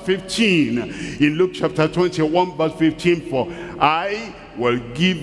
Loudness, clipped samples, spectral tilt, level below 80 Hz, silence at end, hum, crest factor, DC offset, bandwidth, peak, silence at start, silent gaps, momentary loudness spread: -19 LUFS; under 0.1%; -5.5 dB/octave; -48 dBFS; 0 s; none; 18 dB; under 0.1%; 12 kHz; -2 dBFS; 0 s; none; 8 LU